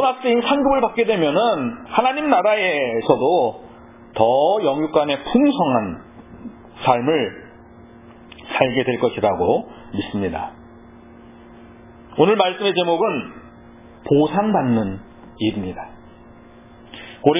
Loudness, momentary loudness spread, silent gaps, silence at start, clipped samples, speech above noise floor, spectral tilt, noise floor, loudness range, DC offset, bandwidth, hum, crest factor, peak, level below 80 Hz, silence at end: -19 LUFS; 20 LU; none; 0 s; under 0.1%; 26 dB; -10 dB/octave; -44 dBFS; 5 LU; under 0.1%; 3.9 kHz; none; 20 dB; 0 dBFS; -50 dBFS; 0 s